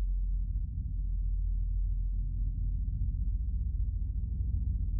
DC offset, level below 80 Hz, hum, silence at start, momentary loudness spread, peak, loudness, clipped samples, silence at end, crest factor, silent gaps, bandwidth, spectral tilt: under 0.1%; -32 dBFS; none; 0 s; 2 LU; -22 dBFS; -36 LUFS; under 0.1%; 0 s; 10 dB; none; 0.5 kHz; -20 dB/octave